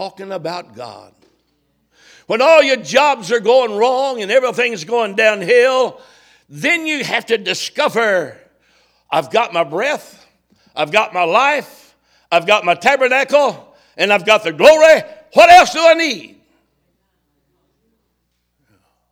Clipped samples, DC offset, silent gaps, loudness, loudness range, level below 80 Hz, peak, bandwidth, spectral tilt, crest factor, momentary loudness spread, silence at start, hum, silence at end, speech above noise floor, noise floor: 0.2%; under 0.1%; none; -13 LUFS; 8 LU; -58 dBFS; 0 dBFS; 17 kHz; -3 dB/octave; 16 dB; 13 LU; 0 s; 60 Hz at -60 dBFS; 2.85 s; 54 dB; -68 dBFS